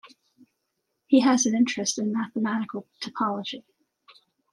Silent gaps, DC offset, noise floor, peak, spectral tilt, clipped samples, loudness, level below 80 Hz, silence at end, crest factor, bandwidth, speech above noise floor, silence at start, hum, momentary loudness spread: none; under 0.1%; -79 dBFS; -8 dBFS; -3.5 dB/octave; under 0.1%; -25 LUFS; -78 dBFS; 0.95 s; 18 dB; 11.5 kHz; 54 dB; 1.1 s; none; 15 LU